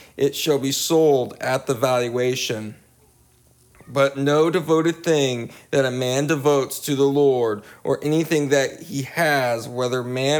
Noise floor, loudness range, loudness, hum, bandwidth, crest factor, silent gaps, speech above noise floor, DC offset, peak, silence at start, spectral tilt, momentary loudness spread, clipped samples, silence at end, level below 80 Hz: -56 dBFS; 2 LU; -21 LUFS; none; 20 kHz; 16 dB; none; 36 dB; under 0.1%; -6 dBFS; 0.15 s; -4.5 dB/octave; 8 LU; under 0.1%; 0 s; -64 dBFS